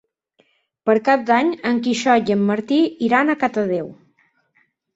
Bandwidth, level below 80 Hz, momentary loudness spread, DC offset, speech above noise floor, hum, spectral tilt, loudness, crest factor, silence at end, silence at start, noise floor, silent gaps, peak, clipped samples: 8 kHz; -64 dBFS; 7 LU; under 0.1%; 46 dB; none; -5.5 dB/octave; -18 LUFS; 18 dB; 1.05 s; 0.85 s; -64 dBFS; none; -2 dBFS; under 0.1%